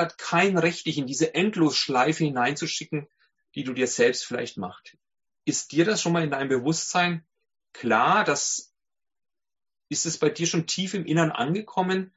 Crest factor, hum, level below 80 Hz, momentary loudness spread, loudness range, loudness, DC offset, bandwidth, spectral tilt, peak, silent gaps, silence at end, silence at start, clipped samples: 20 dB; none; -68 dBFS; 11 LU; 3 LU; -25 LUFS; under 0.1%; 8 kHz; -4 dB/octave; -6 dBFS; none; 0.1 s; 0 s; under 0.1%